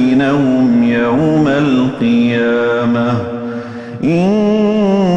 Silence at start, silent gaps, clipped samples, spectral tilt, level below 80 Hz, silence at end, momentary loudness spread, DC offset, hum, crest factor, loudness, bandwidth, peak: 0 s; none; under 0.1%; -8 dB/octave; -46 dBFS; 0 s; 8 LU; under 0.1%; none; 10 dB; -13 LUFS; 8 kHz; -2 dBFS